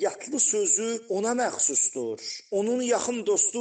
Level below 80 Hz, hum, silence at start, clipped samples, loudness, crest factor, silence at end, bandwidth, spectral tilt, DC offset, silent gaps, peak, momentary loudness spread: -78 dBFS; none; 0 s; under 0.1%; -25 LUFS; 16 dB; 0 s; 9.4 kHz; -2 dB/octave; under 0.1%; none; -10 dBFS; 8 LU